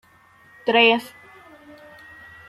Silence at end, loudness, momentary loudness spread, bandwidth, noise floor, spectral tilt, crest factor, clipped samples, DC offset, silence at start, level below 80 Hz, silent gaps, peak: 1.4 s; -18 LUFS; 27 LU; 13.5 kHz; -53 dBFS; -4 dB/octave; 22 dB; under 0.1%; under 0.1%; 0.65 s; -68 dBFS; none; -2 dBFS